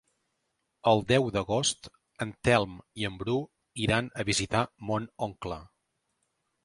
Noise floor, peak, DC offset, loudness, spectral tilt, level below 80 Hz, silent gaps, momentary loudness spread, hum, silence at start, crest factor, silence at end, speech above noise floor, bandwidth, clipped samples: -79 dBFS; -8 dBFS; under 0.1%; -29 LUFS; -4.5 dB/octave; -54 dBFS; none; 12 LU; none; 0.85 s; 22 dB; 1 s; 51 dB; 11.5 kHz; under 0.1%